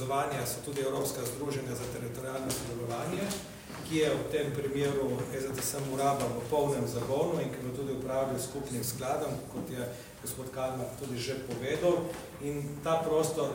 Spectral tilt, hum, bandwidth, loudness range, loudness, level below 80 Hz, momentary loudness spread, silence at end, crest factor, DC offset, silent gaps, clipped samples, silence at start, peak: -5 dB/octave; none; 16.5 kHz; 4 LU; -33 LUFS; -58 dBFS; 9 LU; 0 s; 16 dB; under 0.1%; none; under 0.1%; 0 s; -16 dBFS